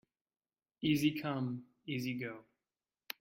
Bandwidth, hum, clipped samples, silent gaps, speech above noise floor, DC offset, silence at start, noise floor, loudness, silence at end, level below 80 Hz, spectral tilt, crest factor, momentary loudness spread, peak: 16.5 kHz; none; under 0.1%; none; over 54 dB; under 0.1%; 0.8 s; under -90 dBFS; -37 LUFS; 0.8 s; -74 dBFS; -5.5 dB/octave; 20 dB; 14 LU; -18 dBFS